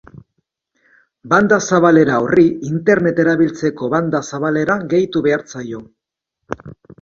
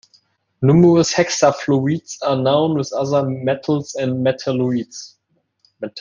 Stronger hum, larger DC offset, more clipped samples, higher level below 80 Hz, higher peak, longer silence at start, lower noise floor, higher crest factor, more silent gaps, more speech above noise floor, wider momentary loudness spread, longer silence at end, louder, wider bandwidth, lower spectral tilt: neither; neither; neither; about the same, -52 dBFS vs -56 dBFS; about the same, 0 dBFS vs -2 dBFS; first, 1.25 s vs 0.6 s; first, -78 dBFS vs -62 dBFS; about the same, 16 dB vs 16 dB; neither; first, 63 dB vs 45 dB; first, 17 LU vs 10 LU; first, 0.3 s vs 0 s; about the same, -15 LUFS vs -17 LUFS; second, 7.4 kHz vs 9.8 kHz; about the same, -6 dB/octave vs -6 dB/octave